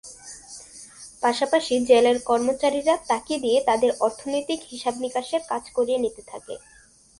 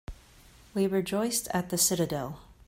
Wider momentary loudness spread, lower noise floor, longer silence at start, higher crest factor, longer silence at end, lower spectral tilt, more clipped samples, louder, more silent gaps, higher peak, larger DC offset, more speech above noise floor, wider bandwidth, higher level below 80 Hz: first, 21 LU vs 13 LU; second, -45 dBFS vs -55 dBFS; about the same, 0.05 s vs 0.1 s; about the same, 20 dB vs 18 dB; first, 0.6 s vs 0.15 s; about the same, -2.5 dB/octave vs -3.5 dB/octave; neither; first, -23 LUFS vs -28 LUFS; neither; first, -4 dBFS vs -12 dBFS; neither; second, 22 dB vs 27 dB; second, 11.5 kHz vs 16.5 kHz; second, -60 dBFS vs -54 dBFS